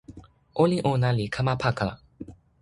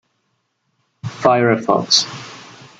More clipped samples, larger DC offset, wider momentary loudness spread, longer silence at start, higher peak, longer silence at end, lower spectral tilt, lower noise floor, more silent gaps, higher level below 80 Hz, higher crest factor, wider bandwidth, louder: neither; neither; about the same, 22 LU vs 20 LU; second, 0.1 s vs 1.05 s; second, -8 dBFS vs 0 dBFS; about the same, 0.3 s vs 0.35 s; first, -7 dB/octave vs -3.5 dB/octave; second, -48 dBFS vs -69 dBFS; neither; first, -50 dBFS vs -62 dBFS; about the same, 20 dB vs 20 dB; first, 11.5 kHz vs 9.2 kHz; second, -25 LUFS vs -15 LUFS